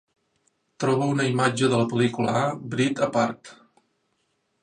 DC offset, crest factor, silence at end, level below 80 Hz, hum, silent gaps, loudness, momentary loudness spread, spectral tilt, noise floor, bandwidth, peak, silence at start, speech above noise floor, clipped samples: under 0.1%; 18 dB; 1.1 s; -66 dBFS; none; none; -24 LUFS; 5 LU; -5.5 dB/octave; -72 dBFS; 10.5 kHz; -8 dBFS; 0.8 s; 49 dB; under 0.1%